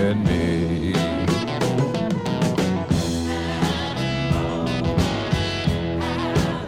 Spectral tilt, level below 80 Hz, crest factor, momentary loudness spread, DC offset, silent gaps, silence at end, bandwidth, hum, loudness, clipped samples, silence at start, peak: -6 dB/octave; -36 dBFS; 14 dB; 3 LU; under 0.1%; none; 0 s; 16 kHz; none; -22 LUFS; under 0.1%; 0 s; -8 dBFS